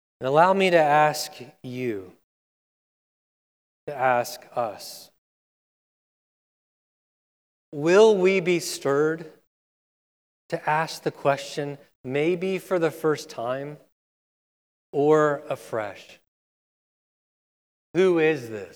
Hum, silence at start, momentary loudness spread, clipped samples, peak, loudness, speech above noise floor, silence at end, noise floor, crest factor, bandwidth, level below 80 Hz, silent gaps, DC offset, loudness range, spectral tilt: none; 0.2 s; 18 LU; under 0.1%; -4 dBFS; -23 LUFS; over 67 dB; 0.05 s; under -90 dBFS; 22 dB; 19 kHz; -78 dBFS; 2.24-3.87 s, 5.18-7.72 s, 9.47-10.49 s, 11.95-12.04 s, 13.92-14.93 s, 16.28-17.94 s; under 0.1%; 8 LU; -5 dB/octave